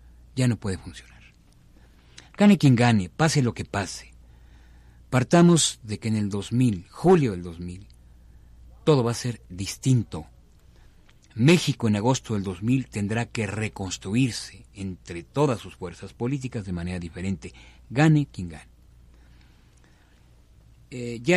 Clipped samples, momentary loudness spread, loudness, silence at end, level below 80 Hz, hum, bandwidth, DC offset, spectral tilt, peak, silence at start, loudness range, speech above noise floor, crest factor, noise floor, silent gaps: under 0.1%; 19 LU; -24 LUFS; 0 s; -50 dBFS; none; 13.5 kHz; under 0.1%; -5.5 dB/octave; -6 dBFS; 0.35 s; 6 LU; 32 dB; 20 dB; -55 dBFS; none